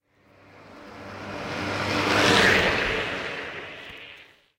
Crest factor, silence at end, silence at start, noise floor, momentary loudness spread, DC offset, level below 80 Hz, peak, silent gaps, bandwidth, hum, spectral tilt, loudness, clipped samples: 22 dB; 0.35 s; 0.55 s; -56 dBFS; 24 LU; under 0.1%; -48 dBFS; -4 dBFS; none; 16 kHz; none; -3.5 dB/octave; -22 LUFS; under 0.1%